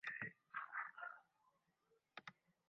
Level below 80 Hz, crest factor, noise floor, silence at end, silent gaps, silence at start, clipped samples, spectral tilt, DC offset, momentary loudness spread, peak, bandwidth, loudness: under -90 dBFS; 22 dB; -83 dBFS; 0.35 s; none; 0.05 s; under 0.1%; -1 dB/octave; under 0.1%; 13 LU; -34 dBFS; 6 kHz; -52 LUFS